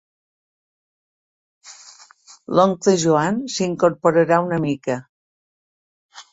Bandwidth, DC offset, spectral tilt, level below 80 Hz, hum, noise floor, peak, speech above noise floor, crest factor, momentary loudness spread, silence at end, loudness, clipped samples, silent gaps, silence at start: 8 kHz; under 0.1%; -5.5 dB/octave; -62 dBFS; none; -48 dBFS; -2 dBFS; 30 dB; 20 dB; 8 LU; 0.1 s; -19 LUFS; under 0.1%; 5.09-6.09 s; 1.65 s